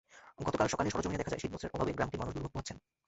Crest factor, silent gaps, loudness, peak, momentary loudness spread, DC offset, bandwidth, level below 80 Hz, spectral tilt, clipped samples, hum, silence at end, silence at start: 22 dB; none; -36 LUFS; -14 dBFS; 9 LU; under 0.1%; 8 kHz; -52 dBFS; -5 dB/octave; under 0.1%; none; 0.3 s; 0.1 s